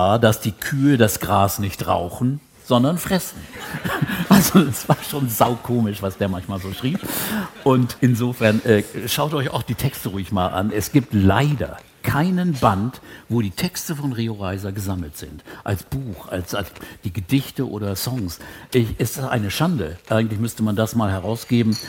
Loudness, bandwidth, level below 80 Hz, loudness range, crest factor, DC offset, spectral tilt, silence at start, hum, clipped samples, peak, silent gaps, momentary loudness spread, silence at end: -21 LUFS; 17 kHz; -48 dBFS; 7 LU; 20 dB; under 0.1%; -5.5 dB/octave; 0 s; none; under 0.1%; 0 dBFS; none; 11 LU; 0 s